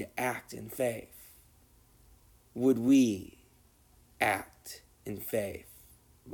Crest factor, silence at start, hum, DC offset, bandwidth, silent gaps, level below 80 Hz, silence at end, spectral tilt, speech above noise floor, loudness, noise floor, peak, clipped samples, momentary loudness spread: 18 dB; 0 s; none; under 0.1%; 19.5 kHz; none; -64 dBFS; 0 s; -5 dB/octave; 33 dB; -31 LUFS; -63 dBFS; -14 dBFS; under 0.1%; 22 LU